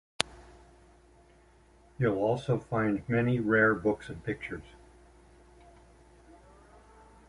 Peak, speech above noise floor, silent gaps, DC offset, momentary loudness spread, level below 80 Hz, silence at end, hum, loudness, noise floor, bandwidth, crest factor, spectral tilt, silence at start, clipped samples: -2 dBFS; 31 dB; none; under 0.1%; 13 LU; -58 dBFS; 2.65 s; none; -29 LUFS; -60 dBFS; 11.5 kHz; 30 dB; -6 dB/octave; 0.2 s; under 0.1%